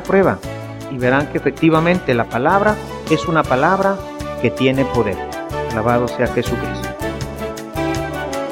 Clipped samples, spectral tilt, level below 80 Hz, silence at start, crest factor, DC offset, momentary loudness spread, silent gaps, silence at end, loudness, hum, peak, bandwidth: under 0.1%; -6 dB/octave; -36 dBFS; 0 s; 18 dB; under 0.1%; 11 LU; none; 0 s; -18 LUFS; none; 0 dBFS; 17 kHz